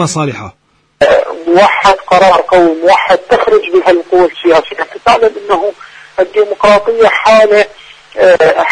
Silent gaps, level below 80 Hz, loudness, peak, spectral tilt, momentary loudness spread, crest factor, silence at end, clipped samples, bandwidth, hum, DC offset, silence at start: none; -42 dBFS; -9 LUFS; 0 dBFS; -4.5 dB/octave; 9 LU; 8 dB; 0 s; 0.4%; 11 kHz; none; under 0.1%; 0 s